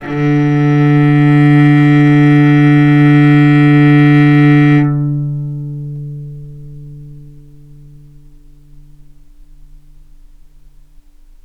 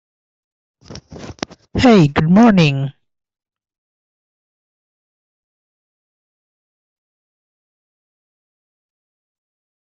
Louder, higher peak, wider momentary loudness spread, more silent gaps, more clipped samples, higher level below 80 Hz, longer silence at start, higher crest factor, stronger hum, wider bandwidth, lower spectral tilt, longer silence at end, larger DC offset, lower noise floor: first, -9 LUFS vs -12 LUFS; about the same, 0 dBFS vs 0 dBFS; about the same, 17 LU vs 19 LU; neither; neither; first, -40 dBFS vs -46 dBFS; second, 0 s vs 0.9 s; second, 10 dB vs 20 dB; neither; second, 5.8 kHz vs 7.8 kHz; first, -9.5 dB/octave vs -7 dB/octave; second, 4.25 s vs 6.95 s; neither; first, -40 dBFS vs -36 dBFS